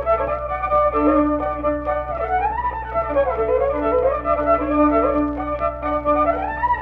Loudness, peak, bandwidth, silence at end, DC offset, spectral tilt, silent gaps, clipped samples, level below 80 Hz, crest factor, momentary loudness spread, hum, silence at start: -20 LUFS; -6 dBFS; 4.7 kHz; 0 s; under 0.1%; -10 dB/octave; none; under 0.1%; -34 dBFS; 14 dB; 6 LU; none; 0 s